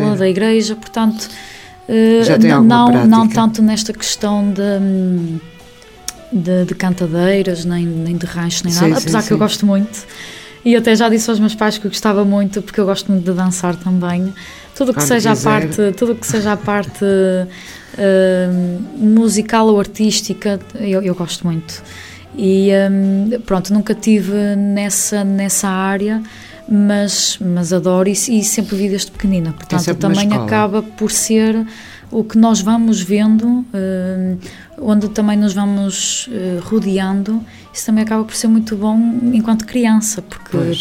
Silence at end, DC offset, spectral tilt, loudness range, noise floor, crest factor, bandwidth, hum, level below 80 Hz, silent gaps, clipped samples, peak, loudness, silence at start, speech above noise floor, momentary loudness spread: 0 s; under 0.1%; -5 dB/octave; 5 LU; -39 dBFS; 14 dB; 16.5 kHz; none; -46 dBFS; none; under 0.1%; 0 dBFS; -14 LUFS; 0 s; 25 dB; 10 LU